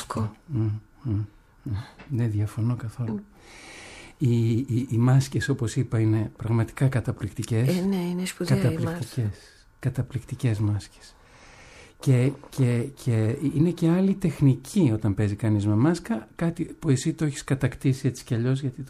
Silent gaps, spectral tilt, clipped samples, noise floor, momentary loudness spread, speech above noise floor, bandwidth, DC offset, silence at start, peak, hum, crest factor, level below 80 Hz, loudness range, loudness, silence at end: none; -7 dB/octave; under 0.1%; -50 dBFS; 10 LU; 25 dB; 13.5 kHz; under 0.1%; 0 s; -10 dBFS; none; 16 dB; -52 dBFS; 6 LU; -26 LUFS; 0 s